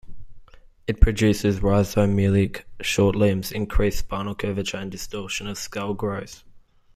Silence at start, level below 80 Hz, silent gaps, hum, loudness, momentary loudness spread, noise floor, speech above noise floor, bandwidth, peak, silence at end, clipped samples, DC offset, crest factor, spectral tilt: 0.05 s; -30 dBFS; none; none; -23 LUFS; 12 LU; -46 dBFS; 25 dB; 15.5 kHz; -2 dBFS; 0.35 s; under 0.1%; under 0.1%; 20 dB; -6 dB/octave